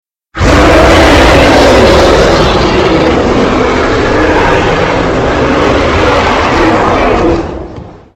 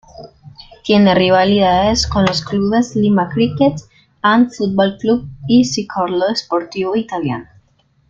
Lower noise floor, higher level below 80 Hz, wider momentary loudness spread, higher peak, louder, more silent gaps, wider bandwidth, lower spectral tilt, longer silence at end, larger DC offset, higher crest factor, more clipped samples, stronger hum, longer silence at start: second, -26 dBFS vs -56 dBFS; first, -18 dBFS vs -40 dBFS; about the same, 6 LU vs 8 LU; about the same, 0 dBFS vs 0 dBFS; first, -7 LUFS vs -15 LUFS; neither; first, 16 kHz vs 7.6 kHz; about the same, -5.5 dB/octave vs -5.5 dB/octave; second, 0.2 s vs 0.65 s; neither; second, 6 dB vs 14 dB; first, 2% vs under 0.1%; neither; first, 0.35 s vs 0.2 s